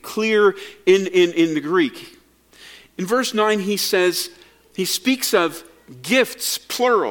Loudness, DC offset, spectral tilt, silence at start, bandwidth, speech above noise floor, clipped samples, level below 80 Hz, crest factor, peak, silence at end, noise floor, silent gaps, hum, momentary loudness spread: -19 LUFS; under 0.1%; -3.5 dB/octave; 0.05 s; 17.5 kHz; 31 dB; under 0.1%; -64 dBFS; 18 dB; -2 dBFS; 0 s; -50 dBFS; none; none; 14 LU